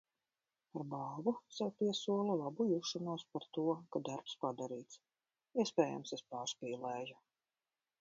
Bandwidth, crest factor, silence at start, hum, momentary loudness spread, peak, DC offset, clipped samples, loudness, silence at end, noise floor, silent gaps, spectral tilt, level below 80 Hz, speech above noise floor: 7.4 kHz; 24 dB; 0.75 s; none; 10 LU; -18 dBFS; under 0.1%; under 0.1%; -40 LUFS; 0.85 s; under -90 dBFS; none; -5 dB/octave; -88 dBFS; over 50 dB